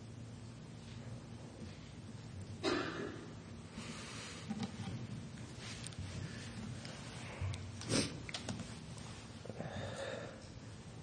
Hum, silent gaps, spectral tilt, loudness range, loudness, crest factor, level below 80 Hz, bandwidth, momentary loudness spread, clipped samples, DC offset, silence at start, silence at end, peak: none; none; -4.5 dB/octave; 3 LU; -45 LUFS; 24 dB; -62 dBFS; 9.8 kHz; 13 LU; under 0.1%; under 0.1%; 0 s; 0 s; -20 dBFS